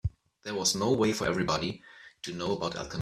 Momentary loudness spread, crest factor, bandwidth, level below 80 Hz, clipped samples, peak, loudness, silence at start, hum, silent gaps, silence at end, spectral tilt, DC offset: 15 LU; 20 dB; 15 kHz; -52 dBFS; under 0.1%; -12 dBFS; -30 LUFS; 0.05 s; none; none; 0 s; -4 dB/octave; under 0.1%